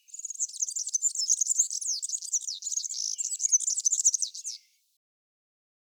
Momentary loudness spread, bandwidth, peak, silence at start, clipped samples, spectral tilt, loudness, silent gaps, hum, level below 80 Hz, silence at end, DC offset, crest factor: 9 LU; over 20 kHz; -12 dBFS; 0.1 s; under 0.1%; 12.5 dB/octave; -26 LUFS; none; none; under -90 dBFS; 1.4 s; under 0.1%; 18 dB